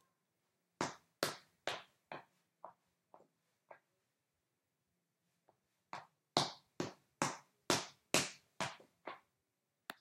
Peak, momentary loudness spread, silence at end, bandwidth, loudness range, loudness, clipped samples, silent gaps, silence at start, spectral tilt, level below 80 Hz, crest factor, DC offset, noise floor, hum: -10 dBFS; 18 LU; 0.1 s; 16 kHz; 21 LU; -41 LUFS; under 0.1%; none; 0.8 s; -2.5 dB/octave; -84 dBFS; 36 dB; under 0.1%; -87 dBFS; none